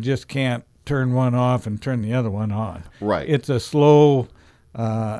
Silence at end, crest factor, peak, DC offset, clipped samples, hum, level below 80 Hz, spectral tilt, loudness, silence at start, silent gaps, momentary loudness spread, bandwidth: 0 s; 16 dB; -4 dBFS; under 0.1%; under 0.1%; none; -50 dBFS; -7.5 dB/octave; -20 LUFS; 0 s; none; 14 LU; 11 kHz